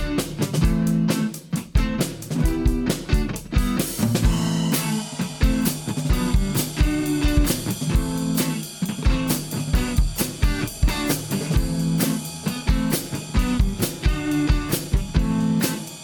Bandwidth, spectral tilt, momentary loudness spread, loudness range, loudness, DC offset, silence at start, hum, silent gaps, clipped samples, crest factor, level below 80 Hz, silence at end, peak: 19 kHz; -5 dB/octave; 5 LU; 1 LU; -23 LUFS; under 0.1%; 0 s; none; none; under 0.1%; 16 dB; -26 dBFS; 0 s; -4 dBFS